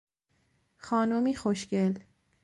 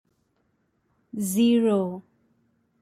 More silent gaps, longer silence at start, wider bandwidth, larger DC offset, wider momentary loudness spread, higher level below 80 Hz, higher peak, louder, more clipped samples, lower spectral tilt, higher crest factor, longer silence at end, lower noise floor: neither; second, 0.85 s vs 1.15 s; second, 11.5 kHz vs 15.5 kHz; neither; second, 4 LU vs 18 LU; first, -64 dBFS vs -70 dBFS; second, -16 dBFS vs -12 dBFS; second, -29 LUFS vs -23 LUFS; neither; about the same, -6.5 dB/octave vs -5.5 dB/octave; about the same, 14 dB vs 16 dB; second, 0.45 s vs 0.8 s; about the same, -73 dBFS vs -71 dBFS